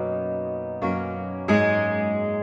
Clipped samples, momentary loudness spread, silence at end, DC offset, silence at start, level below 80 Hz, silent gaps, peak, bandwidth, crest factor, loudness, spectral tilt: under 0.1%; 10 LU; 0 s; under 0.1%; 0 s; -58 dBFS; none; -8 dBFS; 7.6 kHz; 16 dB; -25 LUFS; -8 dB/octave